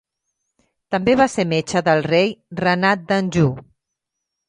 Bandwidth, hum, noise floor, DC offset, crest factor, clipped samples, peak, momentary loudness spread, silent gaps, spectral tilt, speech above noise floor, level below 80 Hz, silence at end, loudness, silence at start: 11 kHz; none; -80 dBFS; under 0.1%; 18 dB; under 0.1%; -2 dBFS; 6 LU; none; -5.5 dB/octave; 62 dB; -52 dBFS; 0.85 s; -18 LUFS; 0.9 s